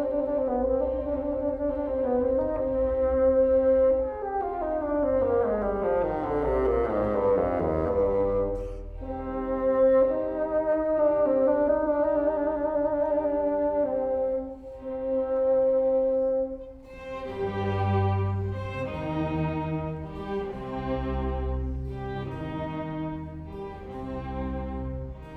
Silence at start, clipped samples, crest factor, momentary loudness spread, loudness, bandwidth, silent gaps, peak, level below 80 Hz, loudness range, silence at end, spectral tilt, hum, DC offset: 0 s; under 0.1%; 14 dB; 12 LU; -27 LUFS; 4.7 kHz; none; -12 dBFS; -40 dBFS; 8 LU; 0 s; -10 dB/octave; none; under 0.1%